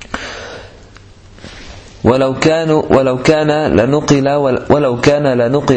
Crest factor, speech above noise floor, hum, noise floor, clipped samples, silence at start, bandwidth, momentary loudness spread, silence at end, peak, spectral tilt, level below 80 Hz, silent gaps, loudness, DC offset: 14 dB; 27 dB; none; -39 dBFS; 0.1%; 0 s; 8.8 kHz; 18 LU; 0 s; 0 dBFS; -6 dB/octave; -38 dBFS; none; -12 LUFS; under 0.1%